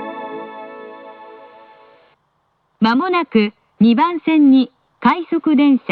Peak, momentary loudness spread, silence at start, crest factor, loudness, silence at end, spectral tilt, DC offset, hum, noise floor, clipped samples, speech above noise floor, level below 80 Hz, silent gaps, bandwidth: -2 dBFS; 21 LU; 0 s; 16 dB; -15 LUFS; 0.15 s; -8.5 dB/octave; under 0.1%; none; -65 dBFS; under 0.1%; 51 dB; -62 dBFS; none; 5 kHz